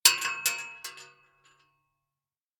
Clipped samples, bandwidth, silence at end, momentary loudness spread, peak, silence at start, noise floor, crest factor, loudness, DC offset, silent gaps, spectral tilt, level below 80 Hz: under 0.1%; over 20 kHz; 1.55 s; 19 LU; -2 dBFS; 0.05 s; under -90 dBFS; 30 dB; -27 LUFS; under 0.1%; none; 3 dB/octave; -74 dBFS